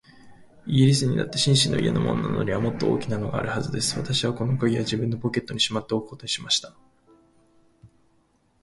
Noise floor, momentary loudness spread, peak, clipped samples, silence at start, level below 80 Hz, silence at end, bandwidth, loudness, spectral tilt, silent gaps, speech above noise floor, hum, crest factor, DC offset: -64 dBFS; 8 LU; -6 dBFS; under 0.1%; 0.25 s; -52 dBFS; 0.75 s; 11.5 kHz; -24 LUFS; -5 dB/octave; none; 41 dB; none; 20 dB; under 0.1%